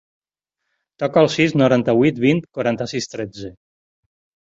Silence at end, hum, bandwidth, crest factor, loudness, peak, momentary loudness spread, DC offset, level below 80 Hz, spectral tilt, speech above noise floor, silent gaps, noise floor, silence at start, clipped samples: 1 s; none; 7.8 kHz; 18 dB; -18 LUFS; -2 dBFS; 14 LU; under 0.1%; -56 dBFS; -6 dB/octave; 62 dB; none; -80 dBFS; 1 s; under 0.1%